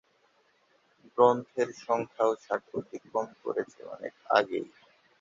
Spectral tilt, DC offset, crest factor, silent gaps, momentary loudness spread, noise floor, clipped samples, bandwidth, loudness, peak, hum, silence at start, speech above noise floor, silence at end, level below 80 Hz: -5 dB/octave; under 0.1%; 22 dB; none; 17 LU; -68 dBFS; under 0.1%; 7.6 kHz; -30 LUFS; -8 dBFS; none; 1.15 s; 39 dB; 0.55 s; -76 dBFS